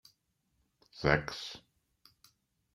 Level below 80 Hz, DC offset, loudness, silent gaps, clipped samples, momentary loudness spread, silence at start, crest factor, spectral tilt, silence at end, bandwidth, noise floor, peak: -56 dBFS; under 0.1%; -33 LUFS; none; under 0.1%; 22 LU; 0.95 s; 30 dB; -5.5 dB/octave; 1.15 s; 15.5 kHz; -78 dBFS; -8 dBFS